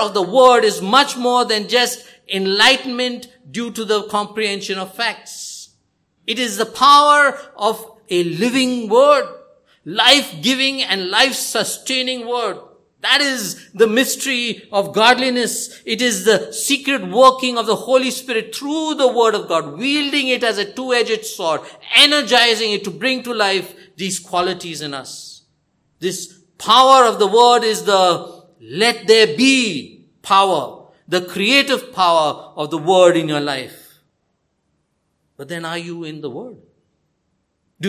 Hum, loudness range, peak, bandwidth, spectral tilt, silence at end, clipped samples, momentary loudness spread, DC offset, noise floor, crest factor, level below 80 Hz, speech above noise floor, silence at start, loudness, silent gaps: none; 8 LU; 0 dBFS; 16 kHz; -2.5 dB/octave; 0 s; under 0.1%; 16 LU; under 0.1%; -68 dBFS; 18 dB; -66 dBFS; 52 dB; 0 s; -15 LUFS; none